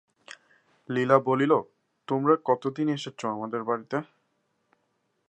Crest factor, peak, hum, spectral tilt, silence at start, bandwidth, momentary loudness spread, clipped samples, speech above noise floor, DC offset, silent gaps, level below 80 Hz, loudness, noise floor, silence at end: 22 dB; -6 dBFS; none; -7 dB/octave; 0.3 s; 9.4 kHz; 11 LU; under 0.1%; 49 dB; under 0.1%; none; -78 dBFS; -26 LUFS; -74 dBFS; 1.25 s